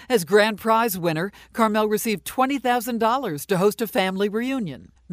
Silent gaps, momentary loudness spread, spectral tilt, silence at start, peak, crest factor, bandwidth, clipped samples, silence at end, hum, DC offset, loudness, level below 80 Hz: none; 8 LU; -4.5 dB/octave; 0 s; -6 dBFS; 16 dB; 16 kHz; under 0.1%; 0 s; none; under 0.1%; -22 LUFS; -58 dBFS